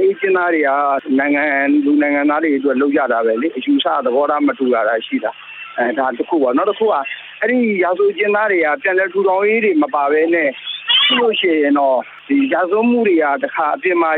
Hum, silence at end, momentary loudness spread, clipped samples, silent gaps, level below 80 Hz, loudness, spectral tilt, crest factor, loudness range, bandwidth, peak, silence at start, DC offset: none; 0 s; 5 LU; under 0.1%; none; -70 dBFS; -15 LUFS; -7.5 dB/octave; 12 dB; 3 LU; 4.2 kHz; -4 dBFS; 0 s; under 0.1%